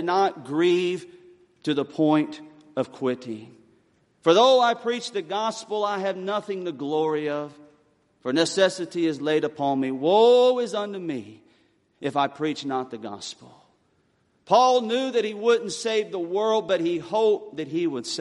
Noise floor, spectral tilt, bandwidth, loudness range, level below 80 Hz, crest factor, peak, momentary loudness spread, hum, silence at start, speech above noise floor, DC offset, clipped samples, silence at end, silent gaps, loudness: -66 dBFS; -4.5 dB/octave; 11.5 kHz; 6 LU; -76 dBFS; 20 dB; -4 dBFS; 15 LU; none; 0 s; 43 dB; under 0.1%; under 0.1%; 0 s; none; -24 LUFS